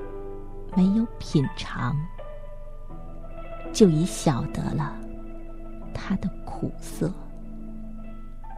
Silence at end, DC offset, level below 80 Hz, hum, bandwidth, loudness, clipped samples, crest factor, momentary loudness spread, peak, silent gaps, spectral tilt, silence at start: 0 s; under 0.1%; -36 dBFS; none; 14 kHz; -26 LUFS; under 0.1%; 22 dB; 21 LU; -4 dBFS; none; -6.5 dB/octave; 0 s